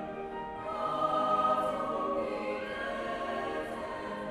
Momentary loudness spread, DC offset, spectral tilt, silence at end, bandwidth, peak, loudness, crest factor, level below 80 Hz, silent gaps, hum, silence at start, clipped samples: 10 LU; under 0.1%; -5.5 dB/octave; 0 s; 13.5 kHz; -16 dBFS; -33 LUFS; 16 dB; -60 dBFS; none; none; 0 s; under 0.1%